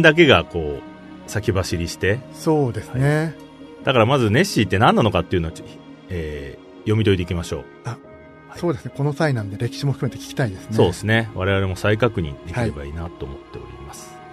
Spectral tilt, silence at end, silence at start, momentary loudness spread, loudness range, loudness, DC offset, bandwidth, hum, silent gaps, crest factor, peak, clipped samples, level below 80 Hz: -6 dB/octave; 0 s; 0 s; 20 LU; 6 LU; -20 LUFS; under 0.1%; 13.5 kHz; none; none; 20 dB; 0 dBFS; under 0.1%; -42 dBFS